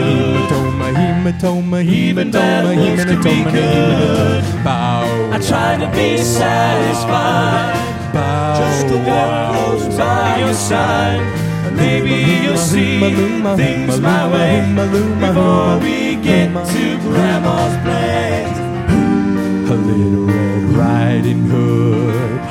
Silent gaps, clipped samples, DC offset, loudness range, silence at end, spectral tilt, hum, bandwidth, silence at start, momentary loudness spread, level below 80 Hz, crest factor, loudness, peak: none; under 0.1%; under 0.1%; 2 LU; 0 s; -6 dB/octave; none; 16 kHz; 0 s; 3 LU; -38 dBFS; 12 dB; -14 LUFS; -2 dBFS